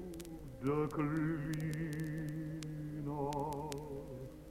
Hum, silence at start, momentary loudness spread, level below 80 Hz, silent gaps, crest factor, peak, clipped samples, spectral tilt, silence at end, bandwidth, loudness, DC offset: none; 0 s; 11 LU; -56 dBFS; none; 20 dB; -20 dBFS; under 0.1%; -7 dB/octave; 0 s; 16.5 kHz; -40 LUFS; under 0.1%